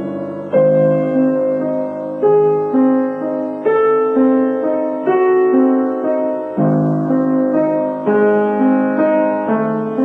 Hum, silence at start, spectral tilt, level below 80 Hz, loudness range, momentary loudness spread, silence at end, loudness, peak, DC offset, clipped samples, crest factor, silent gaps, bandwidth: none; 0 s; -10.5 dB/octave; -62 dBFS; 1 LU; 6 LU; 0 s; -15 LUFS; -4 dBFS; under 0.1%; under 0.1%; 12 dB; none; 3.4 kHz